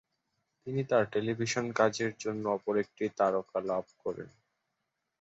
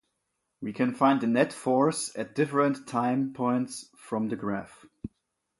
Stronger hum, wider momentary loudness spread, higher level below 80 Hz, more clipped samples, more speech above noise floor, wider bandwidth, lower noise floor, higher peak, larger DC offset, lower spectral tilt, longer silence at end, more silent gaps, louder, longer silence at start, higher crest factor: neither; second, 11 LU vs 16 LU; second, -72 dBFS vs -64 dBFS; neither; about the same, 52 dB vs 53 dB; second, 8 kHz vs 11.5 kHz; first, -84 dBFS vs -80 dBFS; about the same, -12 dBFS vs -10 dBFS; neither; about the same, -5 dB/octave vs -5.5 dB/octave; first, 0.95 s vs 0.55 s; neither; second, -32 LUFS vs -27 LUFS; about the same, 0.65 s vs 0.6 s; about the same, 20 dB vs 18 dB